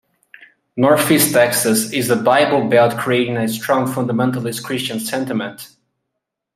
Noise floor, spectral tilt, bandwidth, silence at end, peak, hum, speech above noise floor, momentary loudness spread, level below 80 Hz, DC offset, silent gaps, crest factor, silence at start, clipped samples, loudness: -78 dBFS; -4 dB/octave; 16 kHz; 0.9 s; -2 dBFS; none; 62 dB; 10 LU; -62 dBFS; under 0.1%; none; 16 dB; 0.75 s; under 0.1%; -16 LUFS